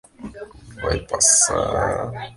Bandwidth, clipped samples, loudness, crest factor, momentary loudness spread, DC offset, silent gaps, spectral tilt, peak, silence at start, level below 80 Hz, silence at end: 12 kHz; under 0.1%; -18 LUFS; 20 dB; 23 LU; under 0.1%; none; -2 dB/octave; -2 dBFS; 0.2 s; -38 dBFS; 0 s